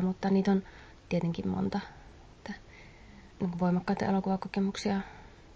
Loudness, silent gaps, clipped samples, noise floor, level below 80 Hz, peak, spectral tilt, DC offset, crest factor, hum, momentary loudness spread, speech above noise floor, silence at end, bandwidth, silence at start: -31 LUFS; none; under 0.1%; -52 dBFS; -56 dBFS; -16 dBFS; -7.5 dB/octave; under 0.1%; 16 dB; none; 23 LU; 22 dB; 0 s; 8 kHz; 0 s